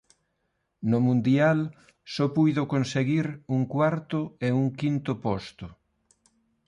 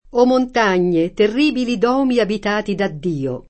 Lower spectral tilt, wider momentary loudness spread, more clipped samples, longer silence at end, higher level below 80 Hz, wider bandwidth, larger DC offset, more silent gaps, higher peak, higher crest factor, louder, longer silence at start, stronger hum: first, -7.5 dB/octave vs -6 dB/octave; first, 11 LU vs 6 LU; neither; first, 0.95 s vs 0.1 s; second, -60 dBFS vs -44 dBFS; first, 10.5 kHz vs 8.6 kHz; neither; neither; second, -12 dBFS vs -2 dBFS; about the same, 16 dB vs 16 dB; second, -26 LUFS vs -17 LUFS; first, 0.8 s vs 0.15 s; neither